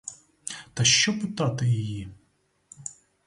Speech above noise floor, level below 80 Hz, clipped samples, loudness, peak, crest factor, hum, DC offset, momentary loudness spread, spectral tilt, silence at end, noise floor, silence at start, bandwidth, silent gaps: 44 dB; -56 dBFS; under 0.1%; -23 LUFS; -6 dBFS; 22 dB; none; under 0.1%; 21 LU; -3 dB/octave; 0.35 s; -69 dBFS; 0.05 s; 11.5 kHz; none